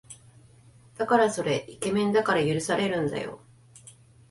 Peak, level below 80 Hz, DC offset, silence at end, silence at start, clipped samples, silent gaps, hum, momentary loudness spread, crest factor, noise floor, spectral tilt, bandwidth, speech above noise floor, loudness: -8 dBFS; -62 dBFS; under 0.1%; 0.4 s; 0.1 s; under 0.1%; none; none; 13 LU; 20 dB; -55 dBFS; -5 dB/octave; 11.5 kHz; 29 dB; -26 LUFS